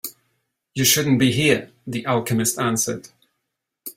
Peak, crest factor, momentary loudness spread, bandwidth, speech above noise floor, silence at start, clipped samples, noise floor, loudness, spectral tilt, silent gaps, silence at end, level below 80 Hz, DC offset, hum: -2 dBFS; 20 dB; 17 LU; 16 kHz; 59 dB; 0.05 s; under 0.1%; -79 dBFS; -20 LUFS; -3.5 dB/octave; none; 0.05 s; -56 dBFS; under 0.1%; none